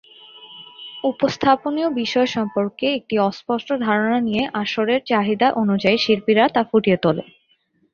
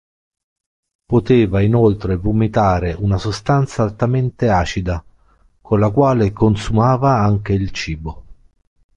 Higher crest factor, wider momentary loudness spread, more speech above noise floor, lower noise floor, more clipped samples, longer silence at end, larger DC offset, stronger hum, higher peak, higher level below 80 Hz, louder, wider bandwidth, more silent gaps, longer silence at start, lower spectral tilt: about the same, 18 dB vs 14 dB; about the same, 8 LU vs 9 LU; first, 44 dB vs 38 dB; first, -63 dBFS vs -54 dBFS; neither; about the same, 0.7 s vs 0.65 s; neither; neither; about the same, -2 dBFS vs -2 dBFS; second, -58 dBFS vs -32 dBFS; about the same, -19 LUFS vs -17 LUFS; second, 7 kHz vs 9 kHz; neither; second, 0.35 s vs 1.1 s; second, -6 dB/octave vs -7.5 dB/octave